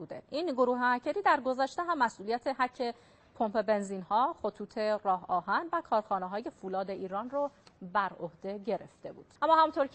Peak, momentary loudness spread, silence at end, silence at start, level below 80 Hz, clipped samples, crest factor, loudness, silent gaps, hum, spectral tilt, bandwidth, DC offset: -12 dBFS; 11 LU; 0.05 s; 0 s; -72 dBFS; under 0.1%; 20 dB; -32 LUFS; none; none; -5.5 dB/octave; 8.4 kHz; under 0.1%